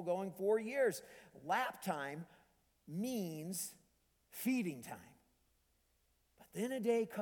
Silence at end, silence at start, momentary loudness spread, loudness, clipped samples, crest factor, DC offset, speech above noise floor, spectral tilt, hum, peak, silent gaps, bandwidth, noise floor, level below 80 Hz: 0 s; 0 s; 16 LU; -40 LUFS; under 0.1%; 18 dB; under 0.1%; 38 dB; -5 dB/octave; none; -22 dBFS; none; 19 kHz; -77 dBFS; -80 dBFS